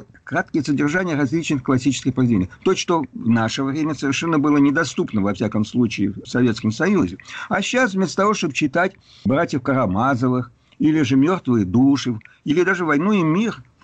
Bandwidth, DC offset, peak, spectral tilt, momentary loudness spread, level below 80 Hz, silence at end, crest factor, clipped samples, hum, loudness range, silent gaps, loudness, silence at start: 8.6 kHz; under 0.1%; -8 dBFS; -6 dB/octave; 6 LU; -52 dBFS; 0.2 s; 12 dB; under 0.1%; none; 2 LU; none; -20 LUFS; 0 s